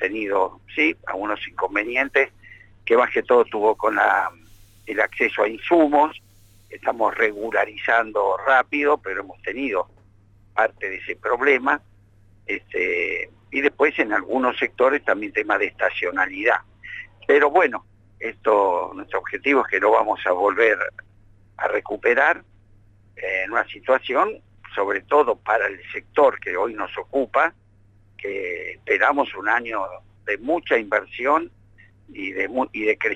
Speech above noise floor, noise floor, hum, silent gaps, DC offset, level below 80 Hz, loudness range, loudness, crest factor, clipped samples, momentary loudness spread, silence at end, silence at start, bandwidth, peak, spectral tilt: 33 dB; -54 dBFS; none; none; under 0.1%; -58 dBFS; 3 LU; -21 LUFS; 18 dB; under 0.1%; 11 LU; 0 s; 0 s; 8.8 kHz; -4 dBFS; -5 dB/octave